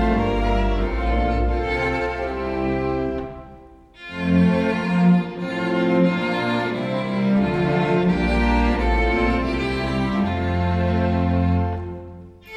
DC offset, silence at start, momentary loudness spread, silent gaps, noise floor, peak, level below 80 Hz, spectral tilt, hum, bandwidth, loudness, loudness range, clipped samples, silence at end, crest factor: under 0.1%; 0 s; 8 LU; none; -45 dBFS; -6 dBFS; -28 dBFS; -8 dB/octave; none; 8.8 kHz; -21 LUFS; 3 LU; under 0.1%; 0 s; 14 dB